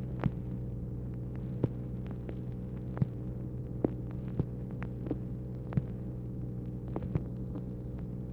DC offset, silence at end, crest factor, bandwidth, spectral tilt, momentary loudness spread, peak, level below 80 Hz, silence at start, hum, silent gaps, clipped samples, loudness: under 0.1%; 0 s; 22 dB; 4 kHz; -11 dB/octave; 5 LU; -14 dBFS; -46 dBFS; 0 s; none; none; under 0.1%; -38 LUFS